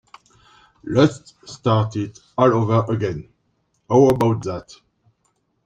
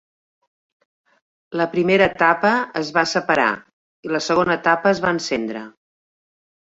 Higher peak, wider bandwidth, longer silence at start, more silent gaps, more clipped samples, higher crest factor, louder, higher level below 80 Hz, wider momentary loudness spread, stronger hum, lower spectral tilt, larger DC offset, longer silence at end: about the same, -2 dBFS vs -2 dBFS; first, 13 kHz vs 8 kHz; second, 0.85 s vs 1.5 s; second, none vs 3.73-4.03 s; neither; about the same, 18 dB vs 20 dB; about the same, -19 LUFS vs -19 LUFS; about the same, -52 dBFS vs -56 dBFS; first, 18 LU vs 13 LU; neither; first, -7.5 dB/octave vs -4.5 dB/octave; neither; about the same, 1.05 s vs 1 s